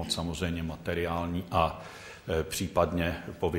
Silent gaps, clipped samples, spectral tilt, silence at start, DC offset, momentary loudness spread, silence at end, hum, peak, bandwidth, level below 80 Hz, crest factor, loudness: none; under 0.1%; -5 dB/octave; 0 s; under 0.1%; 6 LU; 0 s; none; -10 dBFS; 16 kHz; -46 dBFS; 20 dB; -31 LUFS